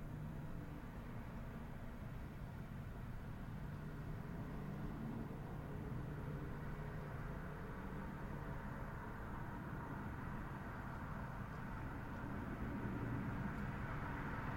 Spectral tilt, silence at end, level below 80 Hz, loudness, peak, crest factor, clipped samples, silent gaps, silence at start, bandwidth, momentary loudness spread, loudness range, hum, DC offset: -8 dB/octave; 0 s; -54 dBFS; -48 LUFS; -32 dBFS; 14 dB; under 0.1%; none; 0 s; 16.5 kHz; 6 LU; 4 LU; none; under 0.1%